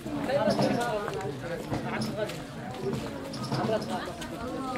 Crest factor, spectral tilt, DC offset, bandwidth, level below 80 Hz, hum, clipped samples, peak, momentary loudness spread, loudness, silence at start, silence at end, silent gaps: 20 dB; -5.5 dB/octave; under 0.1%; 16 kHz; -54 dBFS; none; under 0.1%; -12 dBFS; 10 LU; -31 LUFS; 0 s; 0 s; none